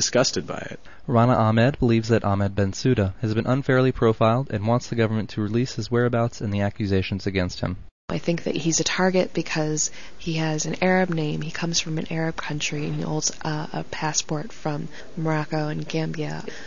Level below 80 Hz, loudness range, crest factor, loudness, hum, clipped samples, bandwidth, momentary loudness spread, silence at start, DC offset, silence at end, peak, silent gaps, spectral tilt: -48 dBFS; 5 LU; 18 dB; -24 LUFS; none; under 0.1%; 7.4 kHz; 10 LU; 0 s; 2%; 0 s; -4 dBFS; 7.91-8.08 s; -5 dB/octave